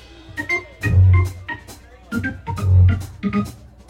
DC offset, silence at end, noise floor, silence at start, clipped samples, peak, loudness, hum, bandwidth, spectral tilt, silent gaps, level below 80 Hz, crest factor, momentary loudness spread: under 0.1%; 0.35 s; -41 dBFS; 0.3 s; under 0.1%; -6 dBFS; -19 LUFS; none; 10.5 kHz; -7.5 dB/octave; none; -34 dBFS; 14 dB; 17 LU